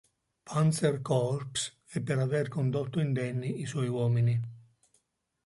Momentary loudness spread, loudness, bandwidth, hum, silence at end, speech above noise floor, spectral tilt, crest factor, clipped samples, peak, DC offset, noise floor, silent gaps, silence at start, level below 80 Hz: 7 LU; -30 LUFS; 11.5 kHz; none; 0.85 s; 47 dB; -6 dB/octave; 16 dB; under 0.1%; -14 dBFS; under 0.1%; -76 dBFS; none; 0.45 s; -66 dBFS